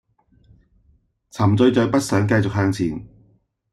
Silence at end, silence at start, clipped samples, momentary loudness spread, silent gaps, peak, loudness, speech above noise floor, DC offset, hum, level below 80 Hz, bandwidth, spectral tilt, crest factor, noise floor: 0.65 s; 1.35 s; under 0.1%; 11 LU; none; -4 dBFS; -19 LUFS; 42 dB; under 0.1%; none; -50 dBFS; 12.5 kHz; -6.5 dB/octave; 16 dB; -60 dBFS